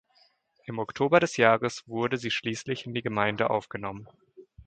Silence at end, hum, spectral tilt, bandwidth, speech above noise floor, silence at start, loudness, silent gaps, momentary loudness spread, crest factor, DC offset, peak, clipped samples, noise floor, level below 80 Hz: 0.05 s; none; -5 dB/octave; 9.2 kHz; 38 dB; 0.65 s; -27 LUFS; none; 15 LU; 24 dB; under 0.1%; -4 dBFS; under 0.1%; -65 dBFS; -64 dBFS